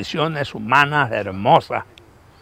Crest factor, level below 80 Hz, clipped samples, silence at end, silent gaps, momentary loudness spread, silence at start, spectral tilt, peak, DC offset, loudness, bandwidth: 20 dB; -54 dBFS; under 0.1%; 0.6 s; none; 11 LU; 0 s; -5.5 dB/octave; 0 dBFS; under 0.1%; -18 LUFS; 15.5 kHz